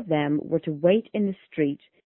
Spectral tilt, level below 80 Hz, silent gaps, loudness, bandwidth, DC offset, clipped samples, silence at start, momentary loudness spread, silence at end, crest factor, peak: -11.5 dB/octave; -66 dBFS; none; -25 LUFS; 4 kHz; under 0.1%; under 0.1%; 0 s; 6 LU; 0.35 s; 18 dB; -8 dBFS